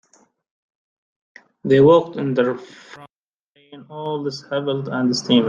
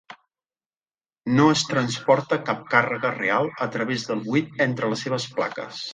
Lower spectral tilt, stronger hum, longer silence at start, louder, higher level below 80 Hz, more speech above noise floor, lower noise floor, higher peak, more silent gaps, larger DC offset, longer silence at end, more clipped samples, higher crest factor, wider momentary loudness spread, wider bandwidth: about the same, -6 dB/octave vs -5 dB/octave; neither; first, 1.65 s vs 0.1 s; first, -19 LUFS vs -23 LUFS; about the same, -62 dBFS vs -66 dBFS; second, 48 dB vs over 67 dB; second, -67 dBFS vs under -90 dBFS; about the same, -2 dBFS vs -2 dBFS; first, 3.10-3.26 s, 3.34-3.55 s vs 0.66-0.70 s, 0.77-0.81 s; neither; about the same, 0 s vs 0 s; neither; about the same, 18 dB vs 22 dB; first, 20 LU vs 8 LU; about the same, 9.2 kHz vs 9.6 kHz